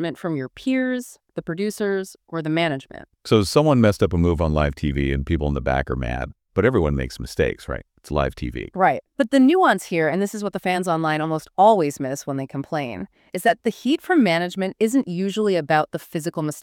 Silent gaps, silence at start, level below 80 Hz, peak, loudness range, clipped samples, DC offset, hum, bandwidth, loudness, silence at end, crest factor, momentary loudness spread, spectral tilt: none; 0 s; -36 dBFS; -2 dBFS; 4 LU; under 0.1%; under 0.1%; none; 17 kHz; -21 LUFS; 0 s; 18 dB; 13 LU; -6 dB/octave